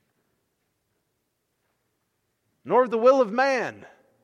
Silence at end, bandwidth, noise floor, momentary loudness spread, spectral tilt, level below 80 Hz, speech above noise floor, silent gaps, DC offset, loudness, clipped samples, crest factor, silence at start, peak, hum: 0.4 s; 7.4 kHz; -76 dBFS; 8 LU; -5 dB/octave; -84 dBFS; 55 dB; none; under 0.1%; -21 LUFS; under 0.1%; 20 dB; 2.65 s; -6 dBFS; none